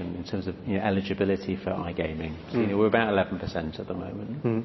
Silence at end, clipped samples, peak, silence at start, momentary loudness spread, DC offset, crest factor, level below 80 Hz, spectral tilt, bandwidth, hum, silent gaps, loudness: 0 s; under 0.1%; -6 dBFS; 0 s; 11 LU; under 0.1%; 22 dB; -48 dBFS; -8 dB/octave; 6 kHz; none; none; -28 LUFS